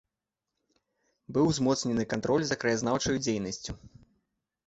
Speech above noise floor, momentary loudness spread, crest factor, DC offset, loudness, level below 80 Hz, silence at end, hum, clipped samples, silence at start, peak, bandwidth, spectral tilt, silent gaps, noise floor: 59 dB; 11 LU; 18 dB; under 0.1%; -29 LUFS; -56 dBFS; 0.8 s; none; under 0.1%; 1.3 s; -14 dBFS; 8.4 kHz; -4.5 dB/octave; none; -88 dBFS